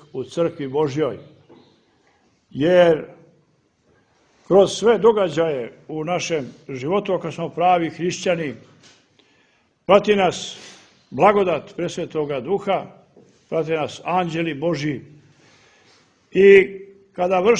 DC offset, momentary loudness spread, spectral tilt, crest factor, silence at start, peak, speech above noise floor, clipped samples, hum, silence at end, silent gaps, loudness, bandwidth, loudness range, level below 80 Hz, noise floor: under 0.1%; 17 LU; -5.5 dB/octave; 20 dB; 0.15 s; 0 dBFS; 43 dB; under 0.1%; none; 0 s; none; -20 LUFS; 9.6 kHz; 5 LU; -58 dBFS; -62 dBFS